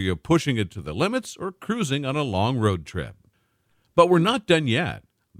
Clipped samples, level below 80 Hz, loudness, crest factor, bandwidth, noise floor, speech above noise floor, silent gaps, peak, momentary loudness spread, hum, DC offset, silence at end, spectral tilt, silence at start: under 0.1%; -52 dBFS; -23 LUFS; 22 dB; 15.5 kHz; -68 dBFS; 45 dB; none; -2 dBFS; 15 LU; none; under 0.1%; 0.4 s; -6 dB/octave; 0 s